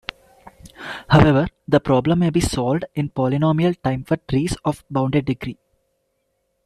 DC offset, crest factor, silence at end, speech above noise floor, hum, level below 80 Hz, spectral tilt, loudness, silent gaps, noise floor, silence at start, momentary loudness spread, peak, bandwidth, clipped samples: under 0.1%; 18 dB; 1.15 s; 52 dB; none; -40 dBFS; -6.5 dB/octave; -19 LUFS; none; -71 dBFS; 0.45 s; 13 LU; -2 dBFS; 13 kHz; under 0.1%